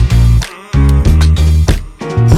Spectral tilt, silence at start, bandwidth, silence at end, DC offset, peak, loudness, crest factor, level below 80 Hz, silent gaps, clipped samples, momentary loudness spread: -6.5 dB/octave; 0 s; 13.5 kHz; 0 s; under 0.1%; 0 dBFS; -11 LUFS; 8 dB; -12 dBFS; none; under 0.1%; 7 LU